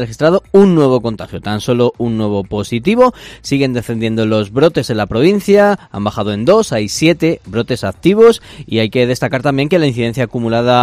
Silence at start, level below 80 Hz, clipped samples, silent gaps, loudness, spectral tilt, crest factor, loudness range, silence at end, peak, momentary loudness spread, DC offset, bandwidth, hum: 0 s; -42 dBFS; 0.3%; none; -13 LUFS; -6 dB/octave; 12 dB; 2 LU; 0 s; 0 dBFS; 9 LU; under 0.1%; 15.5 kHz; none